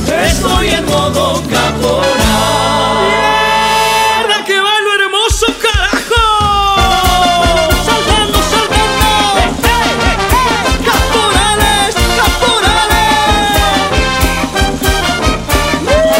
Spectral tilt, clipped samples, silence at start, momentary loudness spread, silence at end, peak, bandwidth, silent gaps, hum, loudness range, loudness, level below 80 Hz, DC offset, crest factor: -3.5 dB/octave; under 0.1%; 0 s; 3 LU; 0 s; 0 dBFS; 16.5 kHz; none; none; 1 LU; -10 LUFS; -20 dBFS; under 0.1%; 10 dB